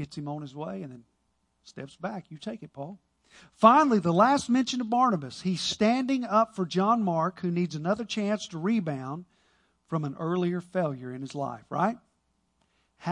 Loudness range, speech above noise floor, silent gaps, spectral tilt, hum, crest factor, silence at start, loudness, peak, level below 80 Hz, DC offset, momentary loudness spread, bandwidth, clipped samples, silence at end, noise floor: 8 LU; 46 dB; none; -6 dB/octave; none; 24 dB; 0 s; -27 LUFS; -4 dBFS; -68 dBFS; under 0.1%; 17 LU; 11 kHz; under 0.1%; 0 s; -74 dBFS